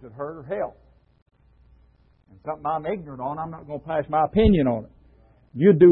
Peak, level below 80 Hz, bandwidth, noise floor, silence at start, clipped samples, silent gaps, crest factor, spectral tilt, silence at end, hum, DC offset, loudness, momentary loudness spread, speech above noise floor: -4 dBFS; -40 dBFS; 4.2 kHz; -58 dBFS; 0 s; under 0.1%; 1.22-1.26 s; 20 dB; -12.5 dB/octave; 0 s; none; under 0.1%; -24 LUFS; 17 LU; 37 dB